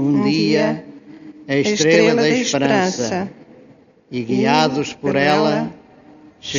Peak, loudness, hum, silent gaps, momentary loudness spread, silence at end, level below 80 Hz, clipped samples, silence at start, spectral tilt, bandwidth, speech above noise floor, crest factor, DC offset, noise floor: 0 dBFS; -17 LUFS; none; none; 15 LU; 0 s; -58 dBFS; under 0.1%; 0 s; -4 dB/octave; 7.4 kHz; 32 dB; 18 dB; under 0.1%; -48 dBFS